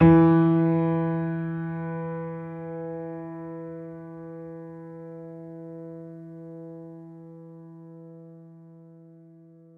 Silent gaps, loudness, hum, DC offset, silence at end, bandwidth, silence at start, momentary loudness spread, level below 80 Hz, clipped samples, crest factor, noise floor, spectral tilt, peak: none; -25 LUFS; none; under 0.1%; 1.15 s; 3.7 kHz; 0 s; 24 LU; -54 dBFS; under 0.1%; 20 dB; -51 dBFS; -12 dB/octave; -6 dBFS